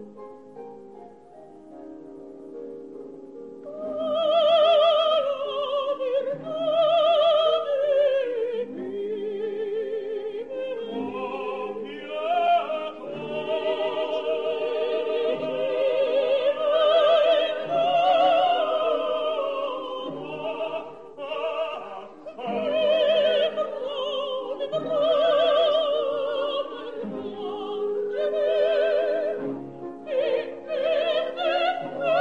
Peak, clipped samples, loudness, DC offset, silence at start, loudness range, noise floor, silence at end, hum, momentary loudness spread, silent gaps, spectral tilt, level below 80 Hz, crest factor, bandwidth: -10 dBFS; under 0.1%; -24 LUFS; 0.2%; 0 s; 9 LU; -47 dBFS; 0 s; none; 19 LU; none; -5 dB/octave; -72 dBFS; 16 dB; 7.2 kHz